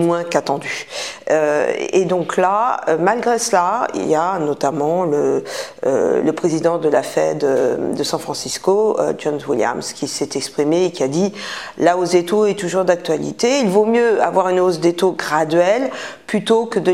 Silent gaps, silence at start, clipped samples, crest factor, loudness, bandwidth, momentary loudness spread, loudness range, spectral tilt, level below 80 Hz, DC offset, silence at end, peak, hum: none; 0 s; under 0.1%; 16 dB; -17 LUFS; 15.5 kHz; 7 LU; 3 LU; -4.5 dB/octave; -62 dBFS; 0.2%; 0 s; 0 dBFS; none